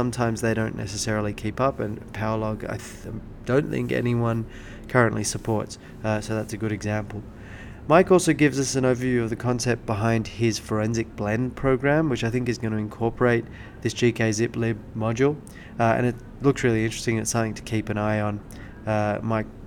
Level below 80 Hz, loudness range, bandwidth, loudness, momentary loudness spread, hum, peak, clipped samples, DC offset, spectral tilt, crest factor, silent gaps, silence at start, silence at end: -44 dBFS; 4 LU; 17 kHz; -24 LUFS; 13 LU; none; -2 dBFS; under 0.1%; under 0.1%; -5.5 dB/octave; 22 dB; none; 0 s; 0 s